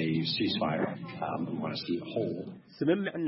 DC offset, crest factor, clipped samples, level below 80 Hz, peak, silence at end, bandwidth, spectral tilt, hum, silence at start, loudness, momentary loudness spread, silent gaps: under 0.1%; 18 dB; under 0.1%; -70 dBFS; -14 dBFS; 0 s; 5.8 kHz; -9.5 dB/octave; none; 0 s; -32 LUFS; 7 LU; none